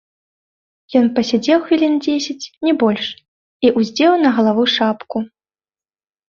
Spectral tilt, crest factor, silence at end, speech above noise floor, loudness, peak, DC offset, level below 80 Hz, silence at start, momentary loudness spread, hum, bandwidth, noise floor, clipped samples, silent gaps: -5 dB/octave; 16 dB; 1 s; over 75 dB; -16 LUFS; -2 dBFS; under 0.1%; -60 dBFS; 0.9 s; 11 LU; none; 7.4 kHz; under -90 dBFS; under 0.1%; 3.28-3.60 s